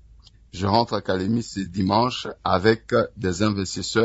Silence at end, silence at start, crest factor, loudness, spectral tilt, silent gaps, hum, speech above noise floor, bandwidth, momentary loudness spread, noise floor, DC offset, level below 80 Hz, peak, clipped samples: 0 s; 0.55 s; 20 dB; -23 LUFS; -5.5 dB/octave; none; none; 28 dB; 8 kHz; 7 LU; -50 dBFS; under 0.1%; -52 dBFS; -4 dBFS; under 0.1%